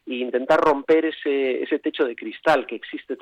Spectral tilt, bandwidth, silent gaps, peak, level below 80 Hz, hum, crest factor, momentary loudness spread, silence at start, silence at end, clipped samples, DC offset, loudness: -5.5 dB/octave; 10.5 kHz; none; -8 dBFS; -62 dBFS; none; 14 dB; 9 LU; 0.05 s; 0.05 s; under 0.1%; under 0.1%; -22 LUFS